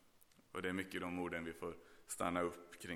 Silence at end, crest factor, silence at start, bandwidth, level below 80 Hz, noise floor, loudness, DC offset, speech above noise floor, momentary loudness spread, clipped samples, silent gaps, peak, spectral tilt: 0 s; 20 dB; 0.05 s; 18.5 kHz; -72 dBFS; -69 dBFS; -44 LUFS; under 0.1%; 25 dB; 11 LU; under 0.1%; none; -24 dBFS; -4.5 dB/octave